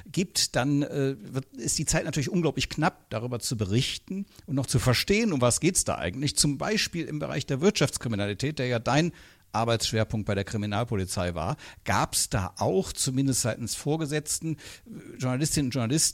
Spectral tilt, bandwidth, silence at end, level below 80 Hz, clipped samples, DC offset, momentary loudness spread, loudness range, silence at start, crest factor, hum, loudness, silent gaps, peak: -4 dB/octave; 16.5 kHz; 0 s; -48 dBFS; under 0.1%; under 0.1%; 9 LU; 3 LU; 0.05 s; 20 dB; none; -27 LUFS; none; -6 dBFS